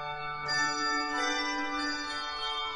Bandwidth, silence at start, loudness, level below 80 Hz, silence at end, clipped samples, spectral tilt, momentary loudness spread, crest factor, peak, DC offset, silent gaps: 11 kHz; 0 s; -31 LUFS; -58 dBFS; 0 s; under 0.1%; -1.5 dB/octave; 6 LU; 14 dB; -18 dBFS; under 0.1%; none